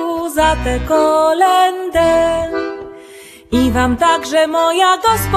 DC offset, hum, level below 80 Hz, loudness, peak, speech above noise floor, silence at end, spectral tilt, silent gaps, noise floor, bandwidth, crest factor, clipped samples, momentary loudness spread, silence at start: under 0.1%; none; -30 dBFS; -14 LUFS; 0 dBFS; 25 dB; 0 s; -4.5 dB/octave; none; -38 dBFS; 14 kHz; 14 dB; under 0.1%; 8 LU; 0 s